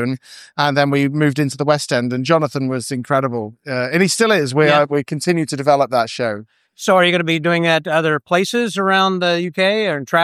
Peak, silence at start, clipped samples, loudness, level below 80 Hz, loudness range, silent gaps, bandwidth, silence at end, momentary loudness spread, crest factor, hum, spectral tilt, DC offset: -2 dBFS; 0 s; under 0.1%; -17 LUFS; -66 dBFS; 2 LU; none; 15 kHz; 0 s; 9 LU; 16 dB; none; -5 dB/octave; under 0.1%